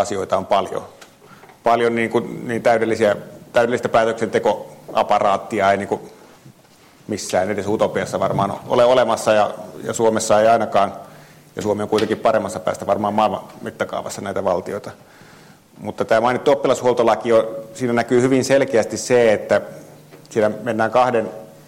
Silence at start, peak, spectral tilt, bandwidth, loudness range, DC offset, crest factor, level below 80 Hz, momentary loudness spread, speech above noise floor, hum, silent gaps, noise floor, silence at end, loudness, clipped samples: 0 s; -6 dBFS; -5 dB/octave; 16.5 kHz; 5 LU; under 0.1%; 14 dB; -58 dBFS; 12 LU; 31 dB; none; none; -49 dBFS; 0.15 s; -19 LUFS; under 0.1%